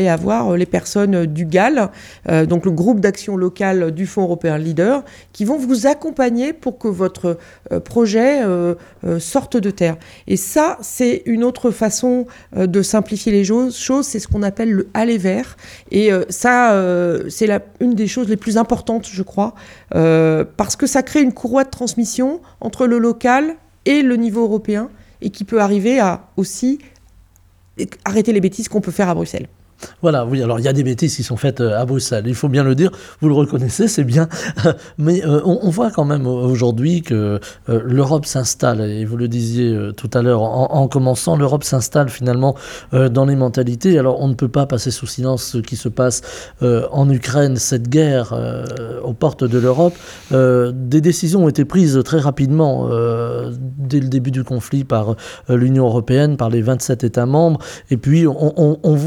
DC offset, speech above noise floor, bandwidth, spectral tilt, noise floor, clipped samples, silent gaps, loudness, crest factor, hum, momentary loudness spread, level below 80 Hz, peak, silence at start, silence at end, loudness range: under 0.1%; 35 dB; 16.5 kHz; -6.5 dB/octave; -50 dBFS; under 0.1%; none; -16 LUFS; 14 dB; none; 8 LU; -46 dBFS; 0 dBFS; 0 s; 0 s; 3 LU